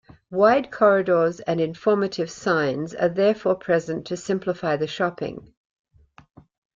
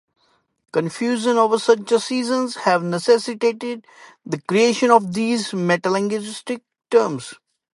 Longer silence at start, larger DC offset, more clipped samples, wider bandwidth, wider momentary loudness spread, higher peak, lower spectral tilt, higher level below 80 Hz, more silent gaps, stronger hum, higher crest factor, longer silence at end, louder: second, 0.3 s vs 0.75 s; neither; neither; second, 7.6 kHz vs 11.5 kHz; second, 10 LU vs 13 LU; second, -4 dBFS vs 0 dBFS; first, -6 dB/octave vs -4.5 dB/octave; first, -62 dBFS vs -72 dBFS; neither; neither; about the same, 18 dB vs 20 dB; first, 1.4 s vs 0.4 s; about the same, -22 LUFS vs -20 LUFS